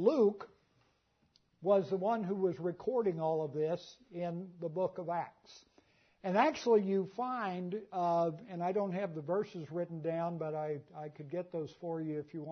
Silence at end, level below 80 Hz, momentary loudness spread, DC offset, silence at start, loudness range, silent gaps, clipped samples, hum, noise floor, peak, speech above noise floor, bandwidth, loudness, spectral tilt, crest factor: 0 s; -80 dBFS; 12 LU; under 0.1%; 0 s; 5 LU; none; under 0.1%; none; -75 dBFS; -16 dBFS; 40 dB; 6.4 kHz; -36 LUFS; -6 dB/octave; 20 dB